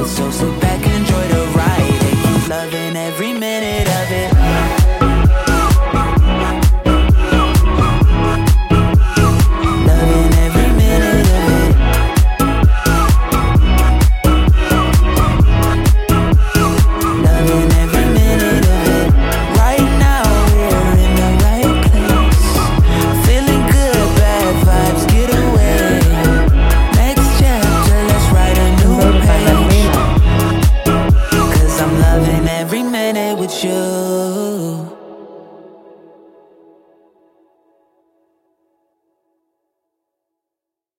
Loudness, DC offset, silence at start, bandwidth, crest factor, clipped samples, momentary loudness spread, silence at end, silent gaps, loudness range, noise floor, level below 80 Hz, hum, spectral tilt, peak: -13 LUFS; under 0.1%; 0 s; 17 kHz; 12 dB; under 0.1%; 5 LU; 5.6 s; none; 4 LU; -84 dBFS; -14 dBFS; none; -6 dB/octave; 0 dBFS